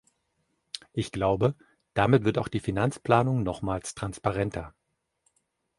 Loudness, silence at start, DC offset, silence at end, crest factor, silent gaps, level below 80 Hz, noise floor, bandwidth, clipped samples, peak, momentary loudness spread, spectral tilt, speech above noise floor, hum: -27 LUFS; 0.75 s; under 0.1%; 1.1 s; 22 dB; none; -50 dBFS; -75 dBFS; 11.5 kHz; under 0.1%; -6 dBFS; 15 LU; -6.5 dB/octave; 49 dB; none